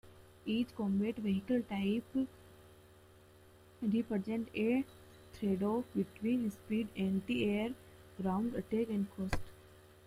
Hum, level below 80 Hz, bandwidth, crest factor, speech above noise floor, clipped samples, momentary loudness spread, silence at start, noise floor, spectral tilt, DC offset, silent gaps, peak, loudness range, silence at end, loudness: none; -58 dBFS; 16 kHz; 20 dB; 25 dB; under 0.1%; 8 LU; 0.05 s; -61 dBFS; -7.5 dB/octave; under 0.1%; none; -18 dBFS; 2 LU; 0.3 s; -37 LUFS